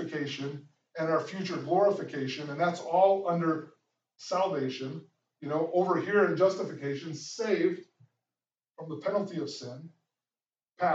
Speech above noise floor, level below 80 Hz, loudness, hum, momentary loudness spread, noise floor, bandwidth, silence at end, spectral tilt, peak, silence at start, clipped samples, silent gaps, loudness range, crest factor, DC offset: over 60 dB; -90 dBFS; -30 LUFS; none; 17 LU; under -90 dBFS; 8 kHz; 0 s; -6 dB/octave; -12 dBFS; 0 s; under 0.1%; none; 6 LU; 20 dB; under 0.1%